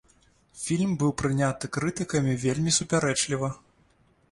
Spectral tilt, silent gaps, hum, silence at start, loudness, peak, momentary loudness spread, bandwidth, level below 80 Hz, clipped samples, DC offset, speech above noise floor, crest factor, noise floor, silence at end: -4.5 dB/octave; none; none; 0.55 s; -26 LUFS; -10 dBFS; 7 LU; 11.5 kHz; -54 dBFS; under 0.1%; under 0.1%; 37 dB; 16 dB; -63 dBFS; 0.75 s